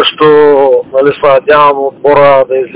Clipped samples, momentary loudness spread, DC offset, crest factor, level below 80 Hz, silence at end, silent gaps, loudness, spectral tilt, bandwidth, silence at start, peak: 10%; 4 LU; under 0.1%; 6 dB; -46 dBFS; 0 s; none; -6 LUFS; -8.5 dB/octave; 4 kHz; 0 s; 0 dBFS